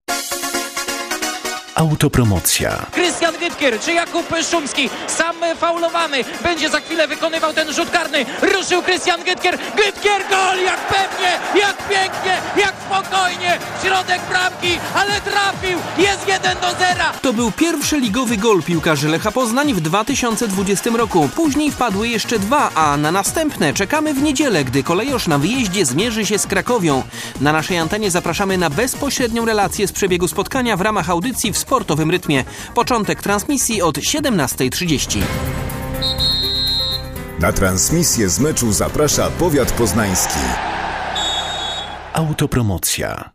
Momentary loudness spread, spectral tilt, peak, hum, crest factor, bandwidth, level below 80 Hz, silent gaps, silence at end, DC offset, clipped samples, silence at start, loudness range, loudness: 5 LU; -3.5 dB/octave; 0 dBFS; none; 16 dB; 15.5 kHz; -36 dBFS; none; 0.05 s; under 0.1%; under 0.1%; 0.1 s; 2 LU; -17 LUFS